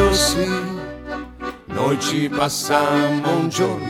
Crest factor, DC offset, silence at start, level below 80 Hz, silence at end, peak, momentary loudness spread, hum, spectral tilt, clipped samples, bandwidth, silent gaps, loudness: 16 dB; under 0.1%; 0 s; -36 dBFS; 0 s; -4 dBFS; 14 LU; none; -4 dB/octave; under 0.1%; 17 kHz; none; -20 LUFS